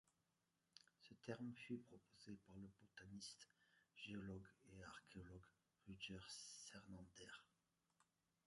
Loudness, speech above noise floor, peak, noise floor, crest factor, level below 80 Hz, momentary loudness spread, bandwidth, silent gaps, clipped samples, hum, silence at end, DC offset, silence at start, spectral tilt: -59 LUFS; 31 dB; -36 dBFS; -89 dBFS; 24 dB; -78 dBFS; 11 LU; 11 kHz; none; under 0.1%; none; 0.45 s; under 0.1%; 0.05 s; -4 dB/octave